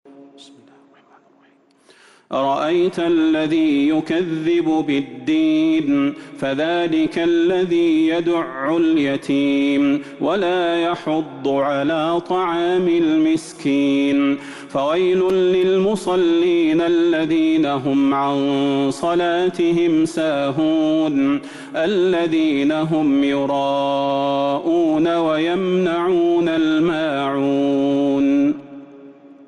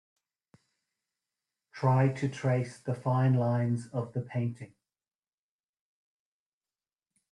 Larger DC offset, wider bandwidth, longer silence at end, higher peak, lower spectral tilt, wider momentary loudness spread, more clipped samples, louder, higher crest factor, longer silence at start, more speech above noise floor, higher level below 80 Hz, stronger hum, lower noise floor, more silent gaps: neither; first, 11.5 kHz vs 10 kHz; second, 0.15 s vs 2.65 s; first, -10 dBFS vs -14 dBFS; second, -6 dB/octave vs -8.5 dB/octave; second, 5 LU vs 10 LU; neither; first, -18 LUFS vs -30 LUFS; second, 8 dB vs 20 dB; second, 0.15 s vs 1.75 s; second, 37 dB vs over 61 dB; first, -58 dBFS vs -70 dBFS; neither; second, -55 dBFS vs under -90 dBFS; neither